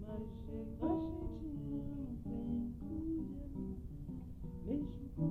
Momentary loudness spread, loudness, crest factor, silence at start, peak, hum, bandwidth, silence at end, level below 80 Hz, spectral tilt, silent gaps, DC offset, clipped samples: 9 LU; -43 LUFS; 16 dB; 0 s; -26 dBFS; none; 14.5 kHz; 0 s; -50 dBFS; -10.5 dB/octave; none; under 0.1%; under 0.1%